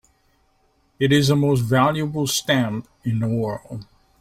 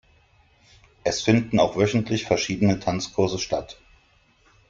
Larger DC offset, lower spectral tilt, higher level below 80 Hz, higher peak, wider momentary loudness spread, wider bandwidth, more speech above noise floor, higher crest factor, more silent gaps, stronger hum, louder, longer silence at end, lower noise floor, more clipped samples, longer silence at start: neither; about the same, -5.5 dB/octave vs -5.5 dB/octave; about the same, -52 dBFS vs -52 dBFS; about the same, -4 dBFS vs -4 dBFS; first, 11 LU vs 8 LU; first, 16 kHz vs 7.8 kHz; first, 43 dB vs 38 dB; about the same, 16 dB vs 20 dB; neither; neither; first, -20 LUFS vs -23 LUFS; second, 0.4 s vs 0.95 s; about the same, -63 dBFS vs -60 dBFS; neither; about the same, 1 s vs 1.05 s